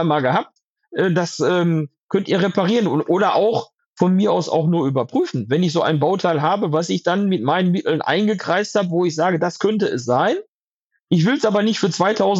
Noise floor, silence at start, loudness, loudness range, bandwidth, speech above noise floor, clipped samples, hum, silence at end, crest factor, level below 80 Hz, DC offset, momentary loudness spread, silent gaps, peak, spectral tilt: -73 dBFS; 0 s; -19 LUFS; 1 LU; 8 kHz; 55 dB; under 0.1%; none; 0 s; 16 dB; -72 dBFS; under 0.1%; 4 LU; 0.64-0.76 s, 2.00-2.09 s, 3.86-3.96 s, 10.48-10.89 s, 11.00-11.07 s; -2 dBFS; -6 dB/octave